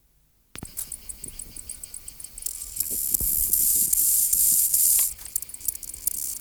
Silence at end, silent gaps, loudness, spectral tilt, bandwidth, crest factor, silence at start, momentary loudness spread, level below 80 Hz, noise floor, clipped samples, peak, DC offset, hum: 0 s; none; -21 LUFS; 0.5 dB/octave; over 20 kHz; 18 dB; 0.55 s; 19 LU; -48 dBFS; -63 dBFS; under 0.1%; -8 dBFS; under 0.1%; none